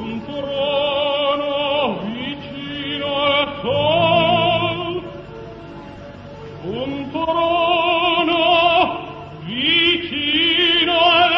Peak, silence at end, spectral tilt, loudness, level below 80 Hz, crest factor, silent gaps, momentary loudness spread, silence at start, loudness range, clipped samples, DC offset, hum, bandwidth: -4 dBFS; 0 s; -6.5 dB/octave; -17 LUFS; -48 dBFS; 14 dB; none; 21 LU; 0 s; 6 LU; under 0.1%; under 0.1%; none; 6.2 kHz